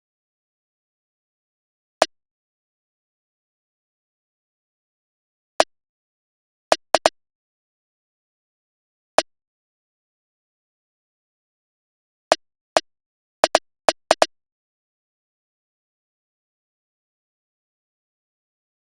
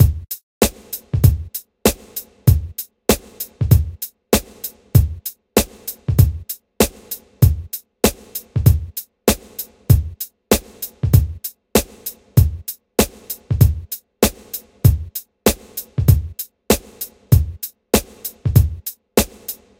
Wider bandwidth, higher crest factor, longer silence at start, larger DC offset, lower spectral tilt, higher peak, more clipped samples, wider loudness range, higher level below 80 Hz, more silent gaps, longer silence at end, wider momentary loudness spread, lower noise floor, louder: second, 0.7 kHz vs 17 kHz; first, 28 dB vs 18 dB; first, 2 s vs 0 s; neither; second, 12 dB/octave vs -5.5 dB/octave; about the same, 0 dBFS vs 0 dBFS; neither; first, 9 LU vs 1 LU; second, -64 dBFS vs -26 dBFS; first, 2.31-5.59 s, 5.89-6.71 s, 7.35-9.18 s, 9.47-12.31 s, 12.61-12.76 s, 13.06-13.43 s vs 0.43-0.61 s; first, 4.7 s vs 0.25 s; second, 3 LU vs 14 LU; first, under -90 dBFS vs -35 dBFS; second, -22 LUFS vs -19 LUFS